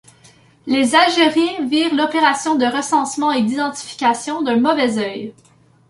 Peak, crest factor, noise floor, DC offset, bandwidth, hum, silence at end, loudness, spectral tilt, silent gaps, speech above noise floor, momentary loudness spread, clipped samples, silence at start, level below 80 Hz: 0 dBFS; 16 dB; -49 dBFS; under 0.1%; 11.5 kHz; none; 0.6 s; -17 LUFS; -3 dB/octave; none; 33 dB; 10 LU; under 0.1%; 0.65 s; -64 dBFS